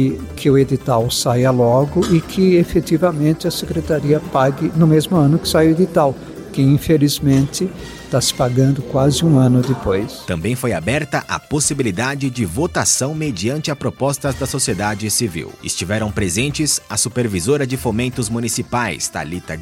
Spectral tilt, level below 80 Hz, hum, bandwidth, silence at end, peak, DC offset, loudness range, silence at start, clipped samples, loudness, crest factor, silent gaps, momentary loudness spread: -5 dB/octave; -40 dBFS; none; 16.5 kHz; 0 s; -2 dBFS; under 0.1%; 4 LU; 0 s; under 0.1%; -17 LUFS; 14 dB; none; 8 LU